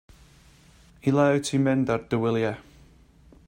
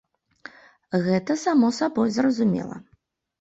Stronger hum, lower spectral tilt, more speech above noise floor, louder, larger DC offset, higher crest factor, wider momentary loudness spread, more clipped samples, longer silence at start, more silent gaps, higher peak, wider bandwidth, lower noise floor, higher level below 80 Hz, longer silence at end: neither; about the same, -6.5 dB/octave vs -6 dB/octave; second, 31 dB vs 43 dB; about the same, -24 LUFS vs -23 LUFS; neither; about the same, 18 dB vs 14 dB; about the same, 8 LU vs 9 LU; neither; first, 1.05 s vs 0.9 s; neither; about the same, -10 dBFS vs -10 dBFS; first, 16 kHz vs 8 kHz; second, -54 dBFS vs -65 dBFS; first, -56 dBFS vs -64 dBFS; first, 0.85 s vs 0.6 s